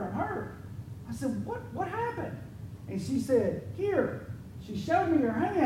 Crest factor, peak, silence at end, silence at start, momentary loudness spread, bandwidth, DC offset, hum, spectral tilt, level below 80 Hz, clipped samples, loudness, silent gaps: 18 dB; -14 dBFS; 0 s; 0 s; 16 LU; 16 kHz; under 0.1%; none; -7 dB/octave; -56 dBFS; under 0.1%; -31 LUFS; none